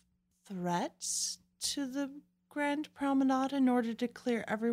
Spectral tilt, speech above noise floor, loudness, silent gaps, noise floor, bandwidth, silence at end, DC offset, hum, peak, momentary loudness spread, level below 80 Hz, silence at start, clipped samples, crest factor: -3.5 dB/octave; 35 dB; -34 LUFS; none; -68 dBFS; 16 kHz; 0 s; under 0.1%; none; -20 dBFS; 10 LU; -76 dBFS; 0.5 s; under 0.1%; 14 dB